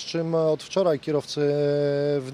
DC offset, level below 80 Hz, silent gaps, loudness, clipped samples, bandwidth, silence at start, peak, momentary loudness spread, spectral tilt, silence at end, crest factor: under 0.1%; -68 dBFS; none; -24 LUFS; under 0.1%; 11.5 kHz; 0 s; -10 dBFS; 3 LU; -6 dB/octave; 0 s; 14 dB